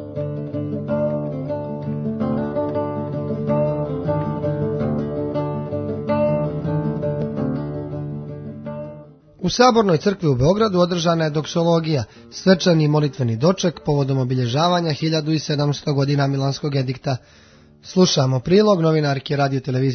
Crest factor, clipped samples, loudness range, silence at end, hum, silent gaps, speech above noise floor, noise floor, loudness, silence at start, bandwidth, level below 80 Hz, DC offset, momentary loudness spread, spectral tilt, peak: 20 dB; under 0.1%; 6 LU; 0 s; none; none; 24 dB; -42 dBFS; -20 LUFS; 0 s; 6.6 kHz; -48 dBFS; under 0.1%; 11 LU; -6.5 dB/octave; 0 dBFS